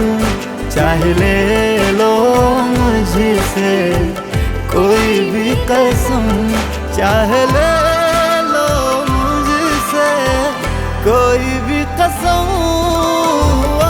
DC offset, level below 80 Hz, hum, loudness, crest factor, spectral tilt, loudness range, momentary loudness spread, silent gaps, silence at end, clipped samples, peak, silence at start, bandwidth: under 0.1%; -24 dBFS; none; -13 LUFS; 12 dB; -5 dB/octave; 2 LU; 5 LU; none; 0 s; under 0.1%; -2 dBFS; 0 s; over 20 kHz